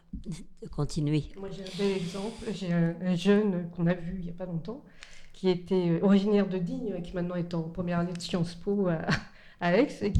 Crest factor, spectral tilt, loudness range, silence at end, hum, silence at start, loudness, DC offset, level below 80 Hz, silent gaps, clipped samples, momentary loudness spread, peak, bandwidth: 20 dB; -7 dB/octave; 3 LU; 0 s; none; 0.15 s; -29 LUFS; under 0.1%; -50 dBFS; none; under 0.1%; 15 LU; -8 dBFS; 11 kHz